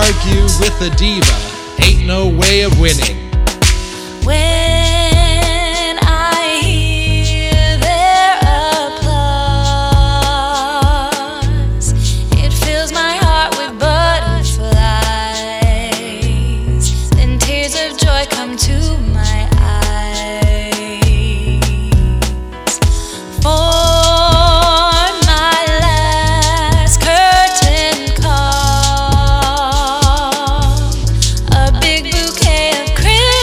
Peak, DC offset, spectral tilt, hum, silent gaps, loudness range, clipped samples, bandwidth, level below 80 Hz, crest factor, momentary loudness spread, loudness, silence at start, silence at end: 0 dBFS; under 0.1%; -4 dB/octave; none; none; 4 LU; under 0.1%; 15.5 kHz; -16 dBFS; 12 dB; 7 LU; -12 LUFS; 0 s; 0 s